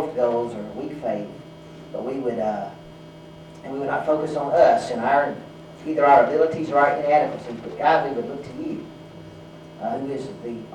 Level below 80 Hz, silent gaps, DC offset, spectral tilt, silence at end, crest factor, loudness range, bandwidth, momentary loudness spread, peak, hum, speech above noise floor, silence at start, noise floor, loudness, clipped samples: -60 dBFS; none; under 0.1%; -6.5 dB/octave; 0 s; 18 dB; 10 LU; 10.5 kHz; 25 LU; -4 dBFS; none; 20 dB; 0 s; -42 dBFS; -22 LUFS; under 0.1%